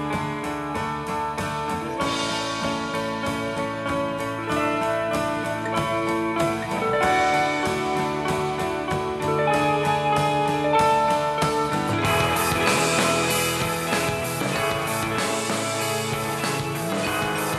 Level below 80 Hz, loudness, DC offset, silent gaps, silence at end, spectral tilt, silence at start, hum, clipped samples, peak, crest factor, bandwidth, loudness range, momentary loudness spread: -48 dBFS; -23 LUFS; under 0.1%; none; 0 s; -4 dB/octave; 0 s; none; under 0.1%; -2 dBFS; 20 dB; 15 kHz; 5 LU; 7 LU